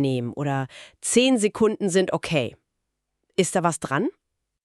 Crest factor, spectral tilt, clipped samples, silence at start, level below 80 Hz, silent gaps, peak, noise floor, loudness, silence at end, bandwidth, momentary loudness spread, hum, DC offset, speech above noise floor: 20 dB; -4.5 dB/octave; under 0.1%; 0 s; -60 dBFS; none; -6 dBFS; -79 dBFS; -23 LUFS; 0.55 s; 13.5 kHz; 10 LU; none; under 0.1%; 57 dB